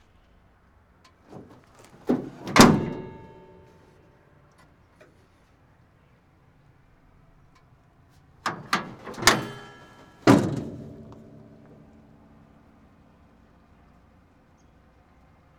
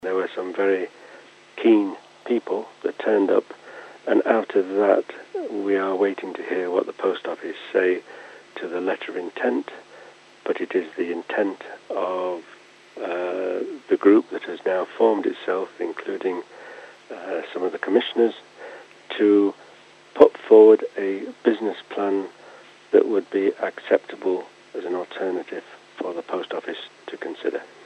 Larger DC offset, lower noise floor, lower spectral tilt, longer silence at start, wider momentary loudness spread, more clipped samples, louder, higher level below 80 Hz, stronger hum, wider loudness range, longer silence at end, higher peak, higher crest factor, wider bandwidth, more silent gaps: neither; first, -59 dBFS vs -49 dBFS; second, -4.5 dB/octave vs -6 dB/octave; first, 1.35 s vs 0.05 s; first, 31 LU vs 18 LU; neither; about the same, -23 LUFS vs -23 LUFS; first, -52 dBFS vs -76 dBFS; neither; first, 12 LU vs 9 LU; first, 4.45 s vs 0.2 s; about the same, 0 dBFS vs 0 dBFS; first, 30 dB vs 22 dB; first, 19.5 kHz vs 8.4 kHz; neither